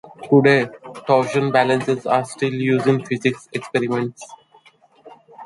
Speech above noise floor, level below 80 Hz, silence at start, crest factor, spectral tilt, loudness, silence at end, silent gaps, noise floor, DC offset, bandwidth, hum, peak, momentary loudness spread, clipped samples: 34 dB; -64 dBFS; 0.05 s; 18 dB; -6.5 dB/octave; -19 LUFS; 0 s; none; -53 dBFS; under 0.1%; 11.5 kHz; none; -2 dBFS; 13 LU; under 0.1%